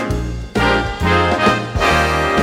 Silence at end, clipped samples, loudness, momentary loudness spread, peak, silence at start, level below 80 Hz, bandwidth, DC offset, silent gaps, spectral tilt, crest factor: 0 s; under 0.1%; -16 LUFS; 8 LU; 0 dBFS; 0 s; -26 dBFS; 16 kHz; under 0.1%; none; -5 dB/octave; 16 dB